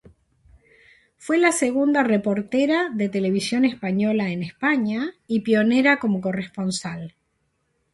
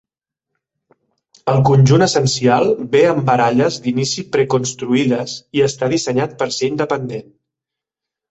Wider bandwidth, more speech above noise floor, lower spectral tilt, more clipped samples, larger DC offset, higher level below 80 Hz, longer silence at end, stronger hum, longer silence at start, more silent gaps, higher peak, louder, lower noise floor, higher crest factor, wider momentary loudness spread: first, 11.5 kHz vs 8.2 kHz; second, 50 dB vs 69 dB; about the same, -5 dB/octave vs -5.5 dB/octave; neither; neither; second, -62 dBFS vs -52 dBFS; second, 0.85 s vs 1.1 s; neither; second, 1.2 s vs 1.45 s; neither; about the same, -4 dBFS vs -2 dBFS; second, -21 LUFS vs -16 LUFS; second, -71 dBFS vs -85 dBFS; about the same, 18 dB vs 16 dB; about the same, 9 LU vs 9 LU